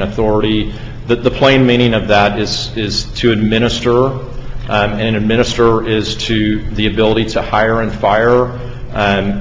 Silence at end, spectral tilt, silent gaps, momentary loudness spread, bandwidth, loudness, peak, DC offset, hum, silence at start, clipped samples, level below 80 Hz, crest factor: 0 s; -5.5 dB/octave; none; 7 LU; 7.8 kHz; -13 LUFS; 0 dBFS; under 0.1%; none; 0 s; under 0.1%; -28 dBFS; 14 dB